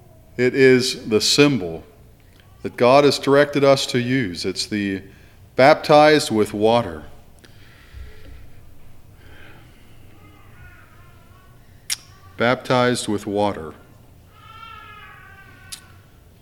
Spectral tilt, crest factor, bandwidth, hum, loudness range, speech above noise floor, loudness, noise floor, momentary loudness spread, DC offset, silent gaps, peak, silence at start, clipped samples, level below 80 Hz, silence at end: -4.5 dB/octave; 20 dB; 18 kHz; none; 12 LU; 31 dB; -17 LUFS; -48 dBFS; 24 LU; under 0.1%; none; 0 dBFS; 0.4 s; under 0.1%; -50 dBFS; 0.65 s